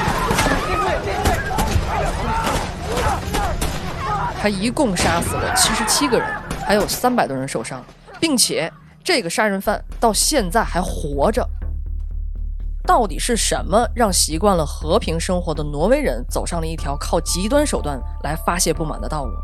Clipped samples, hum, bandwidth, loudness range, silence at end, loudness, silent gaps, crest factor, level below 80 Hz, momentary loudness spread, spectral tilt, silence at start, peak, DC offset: under 0.1%; none; 14.5 kHz; 3 LU; 0 s; -19 LUFS; none; 18 dB; -28 dBFS; 10 LU; -3.5 dB/octave; 0 s; -2 dBFS; under 0.1%